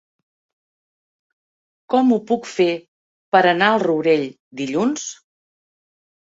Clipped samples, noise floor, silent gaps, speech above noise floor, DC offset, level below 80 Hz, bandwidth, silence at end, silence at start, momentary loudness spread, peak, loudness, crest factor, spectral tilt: under 0.1%; under -90 dBFS; 2.88-3.32 s, 4.40-4.51 s; over 72 dB; under 0.1%; -68 dBFS; 8 kHz; 1.1 s; 1.9 s; 14 LU; -2 dBFS; -18 LUFS; 20 dB; -4.5 dB/octave